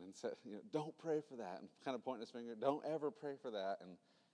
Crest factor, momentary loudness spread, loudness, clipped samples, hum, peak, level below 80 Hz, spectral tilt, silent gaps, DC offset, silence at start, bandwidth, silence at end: 22 dB; 9 LU; -46 LUFS; under 0.1%; none; -24 dBFS; under -90 dBFS; -6 dB/octave; none; under 0.1%; 0 s; 10.5 kHz; 0.35 s